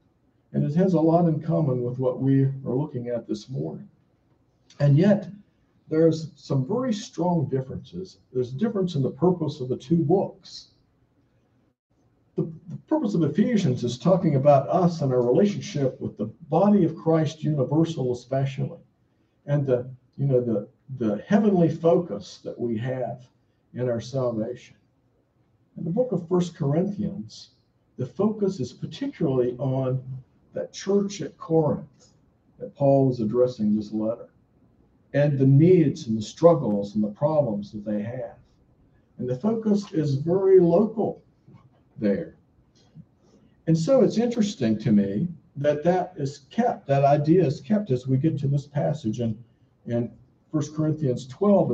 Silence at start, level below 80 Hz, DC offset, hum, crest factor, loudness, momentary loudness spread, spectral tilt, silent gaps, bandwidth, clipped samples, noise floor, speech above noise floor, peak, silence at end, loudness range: 0.55 s; -60 dBFS; under 0.1%; none; 20 dB; -24 LUFS; 15 LU; -8 dB/octave; 11.79-11.90 s; 7.8 kHz; under 0.1%; -66 dBFS; 43 dB; -4 dBFS; 0 s; 6 LU